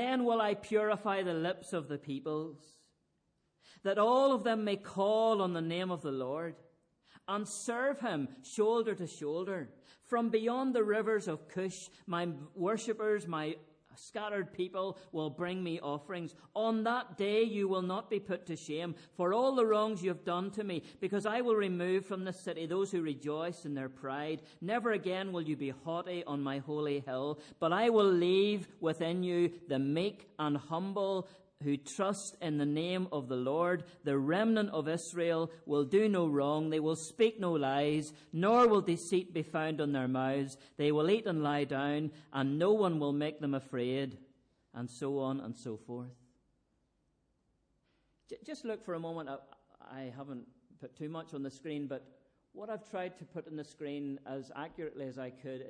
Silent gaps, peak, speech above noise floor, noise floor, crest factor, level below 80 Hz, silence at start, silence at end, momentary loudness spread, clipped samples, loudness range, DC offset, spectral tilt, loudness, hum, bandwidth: none; -18 dBFS; 44 dB; -79 dBFS; 16 dB; -78 dBFS; 0 s; 0 s; 14 LU; under 0.1%; 12 LU; under 0.1%; -6 dB/octave; -35 LUFS; none; 10.5 kHz